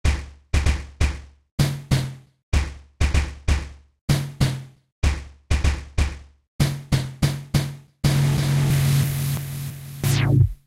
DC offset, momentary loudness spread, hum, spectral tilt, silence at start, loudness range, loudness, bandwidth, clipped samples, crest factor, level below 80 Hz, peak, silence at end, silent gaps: under 0.1%; 13 LU; none; -5.5 dB/octave; 0.05 s; 3 LU; -24 LUFS; 16 kHz; under 0.1%; 16 dB; -28 dBFS; -6 dBFS; 0.1 s; 1.51-1.58 s, 2.43-2.52 s, 4.01-4.08 s, 4.92-5.02 s, 6.48-6.59 s